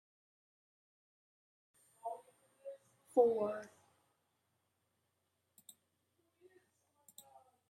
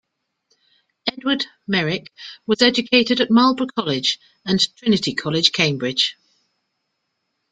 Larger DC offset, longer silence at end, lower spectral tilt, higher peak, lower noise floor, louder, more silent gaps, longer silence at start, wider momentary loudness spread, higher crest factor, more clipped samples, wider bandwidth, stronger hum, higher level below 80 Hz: neither; first, 4.05 s vs 1.4 s; first, -5.5 dB/octave vs -4 dB/octave; second, -18 dBFS vs -2 dBFS; first, -84 dBFS vs -75 dBFS; second, -37 LUFS vs -19 LUFS; neither; first, 2.05 s vs 1.05 s; first, 28 LU vs 11 LU; first, 26 dB vs 20 dB; neither; first, 15 kHz vs 9.2 kHz; neither; second, under -90 dBFS vs -60 dBFS